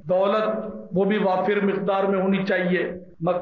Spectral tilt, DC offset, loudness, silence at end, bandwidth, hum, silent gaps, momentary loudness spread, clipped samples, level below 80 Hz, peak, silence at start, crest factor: -9 dB/octave; under 0.1%; -23 LUFS; 0 s; 6 kHz; none; none; 7 LU; under 0.1%; -62 dBFS; -12 dBFS; 0.05 s; 10 dB